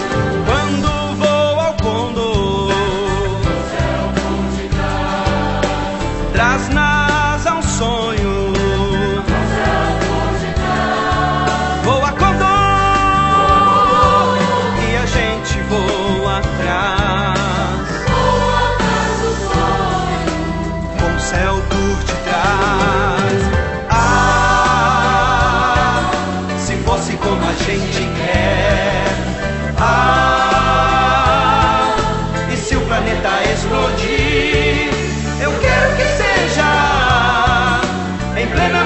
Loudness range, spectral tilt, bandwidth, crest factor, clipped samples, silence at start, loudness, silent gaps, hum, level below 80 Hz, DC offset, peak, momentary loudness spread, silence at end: 4 LU; -5 dB/octave; 8.4 kHz; 14 dB; under 0.1%; 0 s; -15 LUFS; none; none; -24 dBFS; under 0.1%; 0 dBFS; 6 LU; 0 s